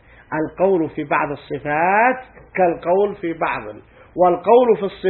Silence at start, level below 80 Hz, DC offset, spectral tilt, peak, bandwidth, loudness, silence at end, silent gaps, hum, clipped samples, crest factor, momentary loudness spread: 0.3 s; -52 dBFS; under 0.1%; -11 dB/octave; 0 dBFS; 4.2 kHz; -18 LUFS; 0 s; none; none; under 0.1%; 18 dB; 14 LU